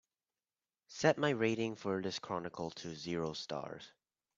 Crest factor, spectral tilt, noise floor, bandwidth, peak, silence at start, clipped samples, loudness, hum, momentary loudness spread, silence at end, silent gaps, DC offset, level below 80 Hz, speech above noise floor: 24 dB; -5 dB/octave; under -90 dBFS; 7.8 kHz; -14 dBFS; 0.9 s; under 0.1%; -37 LUFS; none; 15 LU; 0.5 s; none; under 0.1%; -74 dBFS; over 53 dB